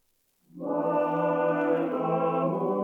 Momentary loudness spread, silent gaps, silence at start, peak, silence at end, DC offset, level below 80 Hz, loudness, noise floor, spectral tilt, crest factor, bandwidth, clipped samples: 4 LU; none; 0.55 s; -14 dBFS; 0 s; under 0.1%; -82 dBFS; -27 LUFS; -70 dBFS; -9.5 dB/octave; 14 dB; 3.8 kHz; under 0.1%